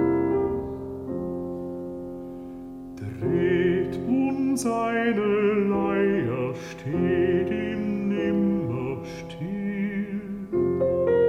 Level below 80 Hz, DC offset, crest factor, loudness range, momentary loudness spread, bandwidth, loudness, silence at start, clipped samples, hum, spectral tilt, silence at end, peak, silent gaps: -52 dBFS; under 0.1%; 14 dB; 5 LU; 13 LU; 13.5 kHz; -26 LUFS; 0 s; under 0.1%; none; -7 dB/octave; 0 s; -12 dBFS; none